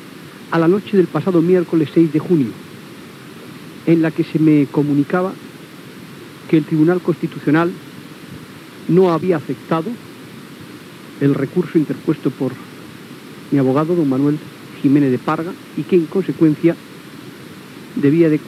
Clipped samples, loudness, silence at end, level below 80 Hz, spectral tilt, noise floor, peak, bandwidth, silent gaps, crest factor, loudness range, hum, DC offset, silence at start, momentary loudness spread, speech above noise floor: under 0.1%; -17 LUFS; 0 s; -68 dBFS; -8 dB/octave; -36 dBFS; -2 dBFS; 14.5 kHz; none; 16 dB; 4 LU; none; under 0.1%; 0 s; 22 LU; 21 dB